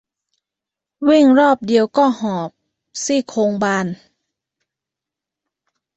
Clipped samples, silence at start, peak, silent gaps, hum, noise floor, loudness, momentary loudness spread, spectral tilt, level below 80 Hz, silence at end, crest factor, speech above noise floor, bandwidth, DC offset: under 0.1%; 1 s; -2 dBFS; none; none; -86 dBFS; -16 LUFS; 15 LU; -5 dB/octave; -64 dBFS; 2 s; 16 dB; 71 dB; 8.2 kHz; under 0.1%